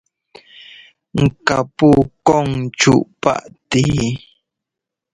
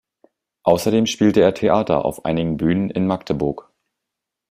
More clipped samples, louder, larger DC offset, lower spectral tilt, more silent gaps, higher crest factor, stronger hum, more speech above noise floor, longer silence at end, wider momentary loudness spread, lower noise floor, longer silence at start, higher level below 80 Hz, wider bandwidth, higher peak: neither; first, -16 LUFS vs -19 LUFS; neither; about the same, -5.5 dB/octave vs -6 dB/octave; neither; about the same, 18 dB vs 18 dB; neither; about the same, 68 dB vs 65 dB; about the same, 0.95 s vs 0.9 s; first, 10 LU vs 7 LU; about the same, -84 dBFS vs -83 dBFS; first, 1.15 s vs 0.65 s; first, -42 dBFS vs -48 dBFS; second, 11.5 kHz vs 16 kHz; about the same, 0 dBFS vs -2 dBFS